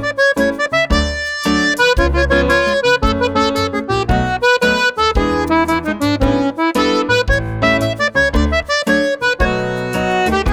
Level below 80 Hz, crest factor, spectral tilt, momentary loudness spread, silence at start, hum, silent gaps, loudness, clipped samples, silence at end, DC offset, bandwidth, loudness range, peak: -24 dBFS; 14 dB; -5 dB/octave; 4 LU; 0 s; none; none; -15 LUFS; under 0.1%; 0 s; under 0.1%; 16 kHz; 1 LU; 0 dBFS